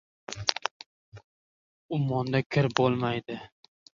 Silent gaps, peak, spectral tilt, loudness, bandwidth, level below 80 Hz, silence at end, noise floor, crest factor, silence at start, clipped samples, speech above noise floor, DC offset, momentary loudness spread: 0.71-0.80 s, 0.86-1.12 s, 1.24-1.89 s, 2.46-2.50 s; -2 dBFS; -5.5 dB/octave; -28 LUFS; 7.4 kHz; -62 dBFS; 0.5 s; under -90 dBFS; 28 dB; 0.3 s; under 0.1%; over 63 dB; under 0.1%; 16 LU